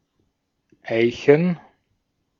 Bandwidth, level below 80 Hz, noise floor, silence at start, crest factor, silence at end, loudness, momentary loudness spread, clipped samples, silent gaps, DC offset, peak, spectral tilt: 7.2 kHz; -62 dBFS; -72 dBFS; 0.85 s; 22 dB; 0.85 s; -19 LUFS; 15 LU; under 0.1%; none; under 0.1%; -2 dBFS; -7.5 dB/octave